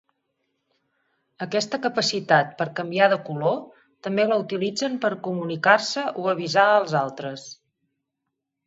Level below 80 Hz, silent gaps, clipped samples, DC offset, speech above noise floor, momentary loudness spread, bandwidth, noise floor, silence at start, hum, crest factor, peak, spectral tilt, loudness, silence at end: -74 dBFS; none; under 0.1%; under 0.1%; 59 dB; 12 LU; 8 kHz; -81 dBFS; 1.4 s; none; 22 dB; -2 dBFS; -4.5 dB/octave; -23 LUFS; 1.15 s